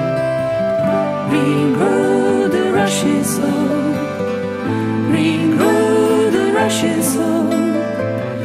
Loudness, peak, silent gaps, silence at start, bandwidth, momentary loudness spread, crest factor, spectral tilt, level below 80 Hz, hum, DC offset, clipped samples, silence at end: -16 LUFS; -2 dBFS; none; 0 s; 16 kHz; 6 LU; 14 dB; -5.5 dB/octave; -54 dBFS; none; under 0.1%; under 0.1%; 0 s